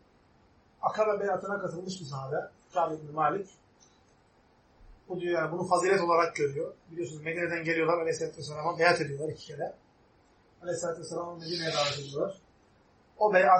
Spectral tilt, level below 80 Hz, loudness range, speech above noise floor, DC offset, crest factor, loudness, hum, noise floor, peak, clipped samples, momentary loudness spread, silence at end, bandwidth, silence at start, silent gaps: -4.5 dB/octave; -68 dBFS; 6 LU; 34 dB; under 0.1%; 22 dB; -31 LUFS; none; -64 dBFS; -8 dBFS; under 0.1%; 13 LU; 0 s; 8.8 kHz; 0.8 s; none